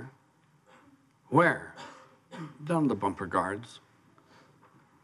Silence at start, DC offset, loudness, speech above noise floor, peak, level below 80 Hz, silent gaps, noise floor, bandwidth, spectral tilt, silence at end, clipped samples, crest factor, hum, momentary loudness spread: 0 s; under 0.1%; -29 LUFS; 37 dB; -10 dBFS; -72 dBFS; none; -65 dBFS; 12 kHz; -7 dB/octave; 1.25 s; under 0.1%; 24 dB; none; 24 LU